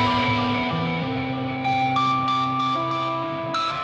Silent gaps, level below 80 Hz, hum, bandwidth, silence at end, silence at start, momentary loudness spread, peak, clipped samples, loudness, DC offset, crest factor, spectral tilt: none; -52 dBFS; none; 8.8 kHz; 0 s; 0 s; 5 LU; -10 dBFS; under 0.1%; -23 LUFS; under 0.1%; 14 dB; -6 dB/octave